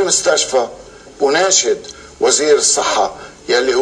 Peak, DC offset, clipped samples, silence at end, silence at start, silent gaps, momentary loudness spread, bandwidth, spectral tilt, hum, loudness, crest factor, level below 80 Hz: 0 dBFS; under 0.1%; under 0.1%; 0 s; 0 s; none; 11 LU; 10.5 kHz; -0.5 dB/octave; none; -14 LUFS; 16 dB; -50 dBFS